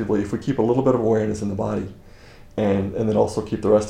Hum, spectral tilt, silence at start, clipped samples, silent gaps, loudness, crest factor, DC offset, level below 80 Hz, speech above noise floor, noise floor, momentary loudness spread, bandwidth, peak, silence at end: none; -7.5 dB/octave; 0 s; under 0.1%; none; -22 LUFS; 18 dB; under 0.1%; -46 dBFS; 24 dB; -44 dBFS; 7 LU; 11 kHz; -4 dBFS; 0 s